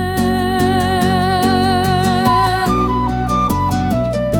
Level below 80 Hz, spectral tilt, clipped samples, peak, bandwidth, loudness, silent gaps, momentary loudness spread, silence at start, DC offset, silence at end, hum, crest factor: -30 dBFS; -6 dB/octave; under 0.1%; -2 dBFS; 18 kHz; -15 LUFS; none; 3 LU; 0 s; under 0.1%; 0 s; none; 14 dB